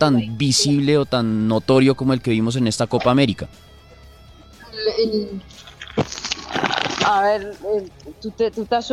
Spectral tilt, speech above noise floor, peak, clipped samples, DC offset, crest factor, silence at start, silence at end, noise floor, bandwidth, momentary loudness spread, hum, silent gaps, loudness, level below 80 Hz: -5 dB/octave; 26 dB; -2 dBFS; under 0.1%; under 0.1%; 18 dB; 0 s; 0 s; -45 dBFS; 14.5 kHz; 15 LU; none; none; -19 LUFS; -48 dBFS